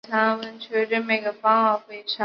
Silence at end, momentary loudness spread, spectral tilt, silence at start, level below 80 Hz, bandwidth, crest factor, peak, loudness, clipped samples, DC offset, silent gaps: 0 s; 9 LU; -6 dB/octave; 0.1 s; -76 dBFS; 6.4 kHz; 16 dB; -6 dBFS; -23 LUFS; under 0.1%; under 0.1%; none